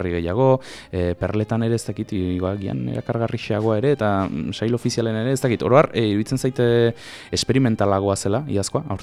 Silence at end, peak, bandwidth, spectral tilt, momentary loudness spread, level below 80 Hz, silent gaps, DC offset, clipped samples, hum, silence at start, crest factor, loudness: 0 s; -2 dBFS; 14 kHz; -6 dB/octave; 8 LU; -46 dBFS; none; under 0.1%; under 0.1%; none; 0 s; 18 dB; -21 LUFS